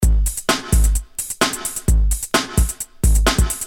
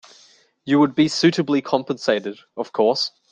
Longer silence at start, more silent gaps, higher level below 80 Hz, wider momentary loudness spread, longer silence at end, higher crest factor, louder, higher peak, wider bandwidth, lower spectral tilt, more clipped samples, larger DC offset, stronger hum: second, 0 s vs 0.65 s; neither; first, -18 dBFS vs -64 dBFS; second, 5 LU vs 13 LU; second, 0 s vs 0.25 s; about the same, 16 dB vs 18 dB; about the same, -19 LUFS vs -20 LUFS; about the same, -2 dBFS vs -4 dBFS; first, 19 kHz vs 9.2 kHz; second, -3.5 dB/octave vs -5 dB/octave; neither; neither; neither